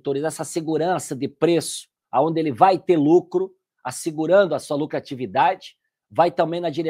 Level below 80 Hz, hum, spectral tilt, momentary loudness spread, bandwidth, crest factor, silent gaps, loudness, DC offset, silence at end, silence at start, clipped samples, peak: -72 dBFS; none; -5.5 dB/octave; 12 LU; 16 kHz; 20 dB; none; -21 LUFS; under 0.1%; 0 s; 0.05 s; under 0.1%; -2 dBFS